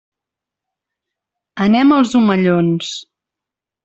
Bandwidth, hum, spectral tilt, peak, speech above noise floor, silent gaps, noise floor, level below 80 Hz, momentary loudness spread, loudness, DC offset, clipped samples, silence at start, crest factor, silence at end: 8.2 kHz; none; -6.5 dB/octave; -2 dBFS; 72 dB; none; -85 dBFS; -58 dBFS; 16 LU; -14 LUFS; under 0.1%; under 0.1%; 1.55 s; 16 dB; 0.85 s